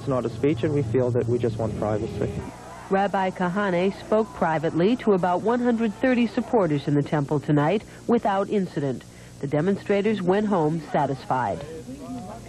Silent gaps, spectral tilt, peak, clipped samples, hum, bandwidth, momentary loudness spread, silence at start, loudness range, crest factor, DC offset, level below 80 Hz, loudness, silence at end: none; -7.5 dB/octave; -10 dBFS; under 0.1%; none; 12.5 kHz; 8 LU; 0 s; 3 LU; 14 dB; under 0.1%; -50 dBFS; -24 LUFS; 0 s